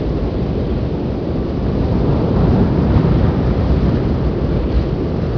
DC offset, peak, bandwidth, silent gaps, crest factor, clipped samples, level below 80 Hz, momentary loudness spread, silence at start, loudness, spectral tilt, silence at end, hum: 0.4%; 0 dBFS; 5.4 kHz; none; 14 dB; under 0.1%; -22 dBFS; 6 LU; 0 s; -17 LUFS; -10 dB/octave; 0 s; none